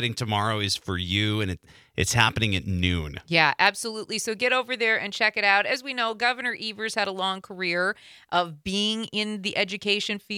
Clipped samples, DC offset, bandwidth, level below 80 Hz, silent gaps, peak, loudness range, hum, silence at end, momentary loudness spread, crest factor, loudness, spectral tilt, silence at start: under 0.1%; under 0.1%; 16.5 kHz; -54 dBFS; none; -2 dBFS; 4 LU; none; 0 s; 8 LU; 22 dB; -24 LUFS; -3.5 dB/octave; 0 s